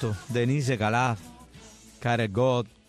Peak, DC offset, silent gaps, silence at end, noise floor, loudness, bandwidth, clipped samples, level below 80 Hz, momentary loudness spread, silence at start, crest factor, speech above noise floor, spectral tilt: -14 dBFS; under 0.1%; none; 0.2 s; -50 dBFS; -26 LUFS; 13.5 kHz; under 0.1%; -56 dBFS; 5 LU; 0 s; 14 dB; 24 dB; -6 dB/octave